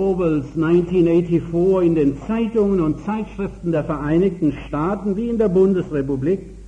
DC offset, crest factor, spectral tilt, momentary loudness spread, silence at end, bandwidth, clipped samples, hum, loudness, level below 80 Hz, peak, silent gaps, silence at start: under 0.1%; 12 dB; -9.5 dB/octave; 7 LU; 0 s; 9 kHz; under 0.1%; none; -19 LUFS; -40 dBFS; -6 dBFS; none; 0 s